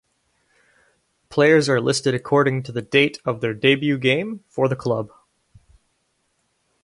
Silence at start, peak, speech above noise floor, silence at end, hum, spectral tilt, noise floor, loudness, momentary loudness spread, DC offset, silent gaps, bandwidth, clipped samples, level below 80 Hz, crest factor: 1.3 s; -2 dBFS; 50 dB; 1.75 s; none; -5 dB/octave; -69 dBFS; -20 LUFS; 11 LU; under 0.1%; none; 11.5 kHz; under 0.1%; -60 dBFS; 20 dB